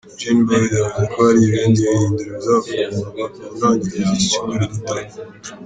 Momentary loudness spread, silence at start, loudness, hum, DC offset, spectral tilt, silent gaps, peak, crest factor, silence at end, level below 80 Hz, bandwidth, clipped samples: 13 LU; 0.05 s; -17 LUFS; none; under 0.1%; -5.5 dB/octave; none; -2 dBFS; 14 dB; 0 s; -48 dBFS; 9.4 kHz; under 0.1%